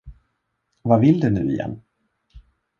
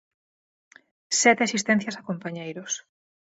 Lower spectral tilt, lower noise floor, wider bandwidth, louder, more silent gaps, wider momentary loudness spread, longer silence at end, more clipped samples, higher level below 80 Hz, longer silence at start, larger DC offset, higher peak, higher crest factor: first, -10 dB/octave vs -3 dB/octave; second, -73 dBFS vs under -90 dBFS; second, 7 kHz vs 8.2 kHz; first, -20 LUFS vs -24 LUFS; neither; about the same, 15 LU vs 14 LU; second, 0.4 s vs 0.55 s; neither; first, -48 dBFS vs -76 dBFS; second, 0.05 s vs 1.1 s; neither; about the same, -2 dBFS vs -4 dBFS; about the same, 20 dB vs 22 dB